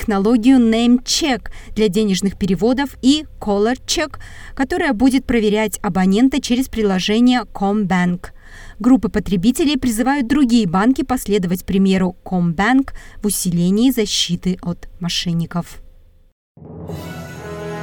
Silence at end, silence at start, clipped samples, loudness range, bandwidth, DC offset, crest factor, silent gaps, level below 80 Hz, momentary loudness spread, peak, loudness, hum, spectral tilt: 0 s; 0 s; under 0.1%; 3 LU; 18 kHz; under 0.1%; 14 dB; 16.32-16.55 s; -36 dBFS; 13 LU; -2 dBFS; -17 LUFS; none; -5 dB/octave